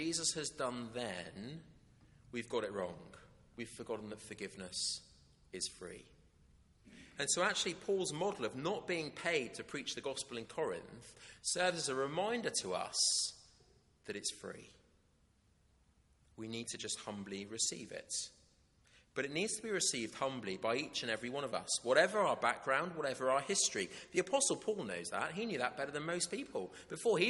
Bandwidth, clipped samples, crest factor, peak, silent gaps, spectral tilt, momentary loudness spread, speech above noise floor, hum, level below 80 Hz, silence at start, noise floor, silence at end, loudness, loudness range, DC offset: 11.5 kHz; under 0.1%; 26 dB; -14 dBFS; none; -2 dB/octave; 16 LU; 34 dB; none; -72 dBFS; 0 s; -72 dBFS; 0 s; -38 LUFS; 10 LU; under 0.1%